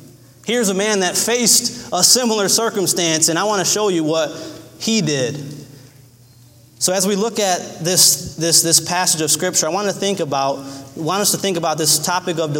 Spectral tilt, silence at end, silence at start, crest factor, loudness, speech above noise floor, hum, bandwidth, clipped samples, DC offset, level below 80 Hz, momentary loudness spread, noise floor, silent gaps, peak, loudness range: -2 dB/octave; 0 s; 0 s; 18 dB; -16 LUFS; 29 dB; none; 16.5 kHz; under 0.1%; under 0.1%; -58 dBFS; 11 LU; -46 dBFS; none; 0 dBFS; 6 LU